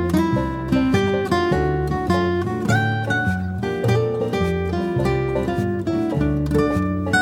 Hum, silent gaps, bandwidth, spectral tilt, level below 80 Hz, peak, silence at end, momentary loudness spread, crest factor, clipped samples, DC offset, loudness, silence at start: none; none; 16.5 kHz; -7 dB/octave; -34 dBFS; -4 dBFS; 0 s; 3 LU; 14 dB; under 0.1%; under 0.1%; -21 LUFS; 0 s